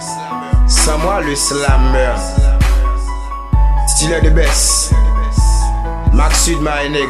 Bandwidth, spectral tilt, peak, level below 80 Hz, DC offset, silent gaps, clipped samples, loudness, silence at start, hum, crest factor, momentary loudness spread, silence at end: 13.5 kHz; -4 dB/octave; 0 dBFS; -14 dBFS; under 0.1%; none; under 0.1%; -14 LUFS; 0 s; none; 12 dB; 7 LU; 0 s